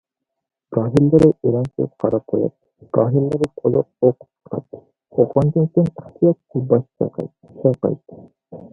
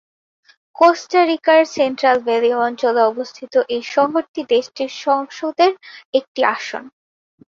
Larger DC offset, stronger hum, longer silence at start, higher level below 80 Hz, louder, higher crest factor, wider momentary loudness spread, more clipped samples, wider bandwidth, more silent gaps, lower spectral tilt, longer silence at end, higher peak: neither; neither; about the same, 0.7 s vs 0.8 s; first, -52 dBFS vs -68 dBFS; about the same, -19 LUFS vs -17 LUFS; about the same, 18 dB vs 16 dB; first, 15 LU vs 11 LU; neither; first, 10.5 kHz vs 7.6 kHz; second, none vs 4.28-4.34 s, 6.05-6.13 s, 6.28-6.35 s; first, -10.5 dB/octave vs -3 dB/octave; second, 0.05 s vs 0.7 s; about the same, 0 dBFS vs -2 dBFS